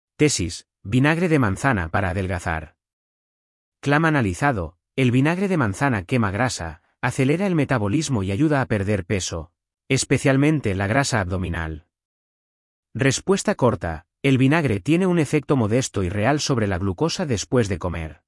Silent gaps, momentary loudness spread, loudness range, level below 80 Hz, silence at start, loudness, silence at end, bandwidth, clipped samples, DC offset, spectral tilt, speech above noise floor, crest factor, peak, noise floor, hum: 2.93-3.72 s, 12.05-12.83 s; 10 LU; 3 LU; -48 dBFS; 0.2 s; -21 LUFS; 0.15 s; 12 kHz; under 0.1%; under 0.1%; -5.5 dB/octave; over 69 dB; 16 dB; -4 dBFS; under -90 dBFS; none